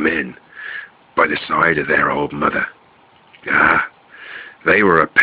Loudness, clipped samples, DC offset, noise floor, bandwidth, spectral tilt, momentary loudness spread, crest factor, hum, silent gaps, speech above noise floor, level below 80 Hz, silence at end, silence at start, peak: -16 LUFS; under 0.1%; under 0.1%; -50 dBFS; 5 kHz; -7 dB/octave; 20 LU; 18 dB; none; none; 35 dB; -50 dBFS; 0 s; 0 s; 0 dBFS